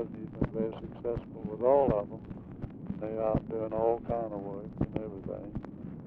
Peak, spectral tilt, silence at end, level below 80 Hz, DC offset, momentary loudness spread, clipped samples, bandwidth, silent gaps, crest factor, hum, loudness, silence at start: -12 dBFS; -11.5 dB/octave; 0 s; -50 dBFS; under 0.1%; 16 LU; under 0.1%; 4.4 kHz; none; 20 dB; none; -33 LUFS; 0 s